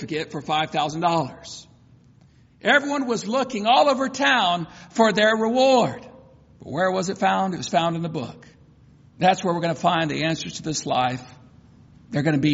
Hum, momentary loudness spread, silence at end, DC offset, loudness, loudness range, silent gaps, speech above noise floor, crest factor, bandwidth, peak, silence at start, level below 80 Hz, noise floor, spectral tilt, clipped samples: none; 12 LU; 0 s; under 0.1%; -22 LUFS; 5 LU; none; 32 dB; 18 dB; 8 kHz; -4 dBFS; 0 s; -60 dBFS; -54 dBFS; -3 dB/octave; under 0.1%